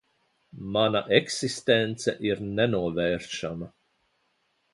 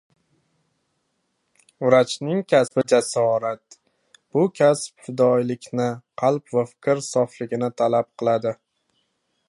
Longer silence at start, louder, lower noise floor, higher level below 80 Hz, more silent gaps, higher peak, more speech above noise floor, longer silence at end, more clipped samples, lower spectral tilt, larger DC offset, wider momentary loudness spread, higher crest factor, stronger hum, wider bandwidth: second, 0.55 s vs 1.8 s; second, -26 LUFS vs -22 LUFS; about the same, -72 dBFS vs -73 dBFS; first, -58 dBFS vs -70 dBFS; neither; about the same, -4 dBFS vs -2 dBFS; second, 46 dB vs 52 dB; about the same, 1.05 s vs 0.95 s; neither; about the same, -4.5 dB/octave vs -5.5 dB/octave; neither; first, 11 LU vs 8 LU; about the same, 24 dB vs 20 dB; neither; about the same, 11.5 kHz vs 11.5 kHz